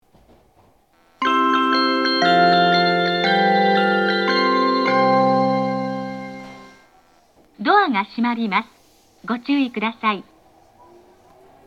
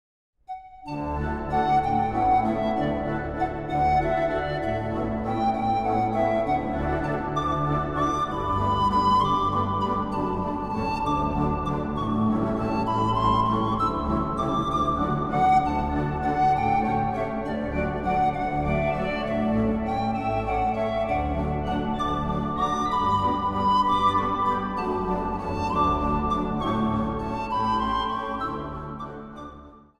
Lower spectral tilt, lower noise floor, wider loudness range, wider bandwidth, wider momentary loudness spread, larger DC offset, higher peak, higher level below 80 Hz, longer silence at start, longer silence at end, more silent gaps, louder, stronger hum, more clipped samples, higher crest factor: second, -6 dB/octave vs -7.5 dB/octave; first, -57 dBFS vs -46 dBFS; first, 7 LU vs 2 LU; second, 10 kHz vs 11.5 kHz; first, 13 LU vs 7 LU; neither; first, -2 dBFS vs -10 dBFS; second, -66 dBFS vs -38 dBFS; first, 1.2 s vs 0.5 s; first, 1.45 s vs 0.2 s; neither; first, -18 LUFS vs -25 LUFS; neither; neither; about the same, 18 dB vs 16 dB